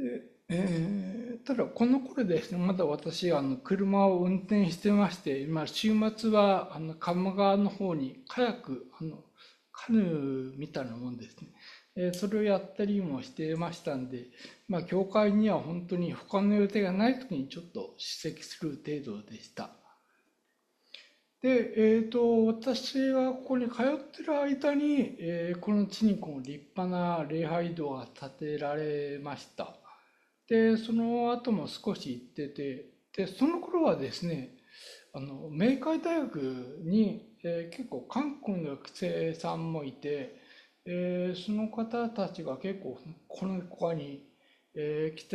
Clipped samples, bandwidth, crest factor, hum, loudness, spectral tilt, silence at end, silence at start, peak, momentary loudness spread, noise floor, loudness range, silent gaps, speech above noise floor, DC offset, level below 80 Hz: under 0.1%; 12.5 kHz; 20 dB; none; -31 LUFS; -7 dB/octave; 0 s; 0 s; -10 dBFS; 16 LU; -76 dBFS; 7 LU; none; 45 dB; under 0.1%; -70 dBFS